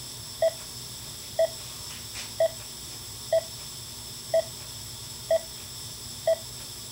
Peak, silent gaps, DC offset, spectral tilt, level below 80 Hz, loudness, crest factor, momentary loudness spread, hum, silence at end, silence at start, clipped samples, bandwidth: -14 dBFS; none; under 0.1%; -2.5 dB/octave; -56 dBFS; -31 LUFS; 18 dB; 9 LU; none; 0 s; 0 s; under 0.1%; 16 kHz